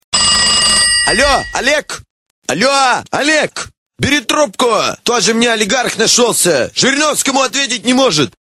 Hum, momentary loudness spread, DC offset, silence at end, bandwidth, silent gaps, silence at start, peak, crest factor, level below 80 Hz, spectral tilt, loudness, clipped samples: none; 9 LU; 0.1%; 0.1 s; 16 kHz; 2.10-2.42 s, 3.77-3.90 s; 0.1 s; 0 dBFS; 12 dB; -38 dBFS; -1.5 dB/octave; -11 LUFS; under 0.1%